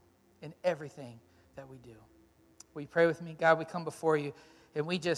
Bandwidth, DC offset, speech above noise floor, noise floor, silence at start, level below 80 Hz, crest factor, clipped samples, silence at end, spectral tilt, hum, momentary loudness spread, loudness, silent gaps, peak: 13 kHz; under 0.1%; 28 dB; -60 dBFS; 0.4 s; -72 dBFS; 22 dB; under 0.1%; 0 s; -5.5 dB/octave; none; 23 LU; -32 LUFS; none; -12 dBFS